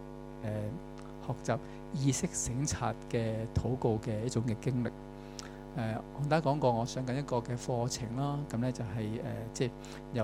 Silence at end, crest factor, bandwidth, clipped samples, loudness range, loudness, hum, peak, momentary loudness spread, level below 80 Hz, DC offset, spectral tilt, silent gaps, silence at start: 0 s; 20 dB; 15 kHz; under 0.1%; 2 LU; -35 LUFS; none; -14 dBFS; 12 LU; -52 dBFS; under 0.1%; -5.5 dB/octave; none; 0 s